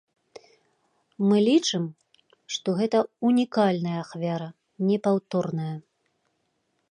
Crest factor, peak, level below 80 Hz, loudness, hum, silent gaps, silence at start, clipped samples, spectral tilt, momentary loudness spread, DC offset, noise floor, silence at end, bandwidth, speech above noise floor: 18 dB; -8 dBFS; -76 dBFS; -25 LUFS; none; none; 1.2 s; under 0.1%; -6 dB/octave; 12 LU; under 0.1%; -74 dBFS; 1.1 s; 10 kHz; 50 dB